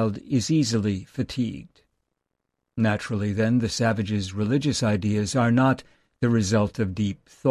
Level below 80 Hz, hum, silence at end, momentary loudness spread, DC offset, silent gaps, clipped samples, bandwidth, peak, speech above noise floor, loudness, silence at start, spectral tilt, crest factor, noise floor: -48 dBFS; none; 0 s; 8 LU; under 0.1%; none; under 0.1%; 12.5 kHz; -8 dBFS; 57 dB; -24 LUFS; 0 s; -6 dB/octave; 16 dB; -80 dBFS